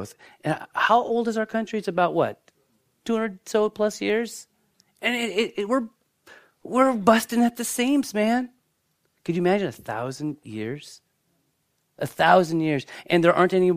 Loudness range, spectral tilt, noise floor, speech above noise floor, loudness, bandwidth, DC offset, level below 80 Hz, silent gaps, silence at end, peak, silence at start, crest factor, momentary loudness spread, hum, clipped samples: 5 LU; -5 dB/octave; -72 dBFS; 49 dB; -23 LUFS; 15.5 kHz; under 0.1%; -68 dBFS; none; 0 s; -2 dBFS; 0 s; 22 dB; 14 LU; none; under 0.1%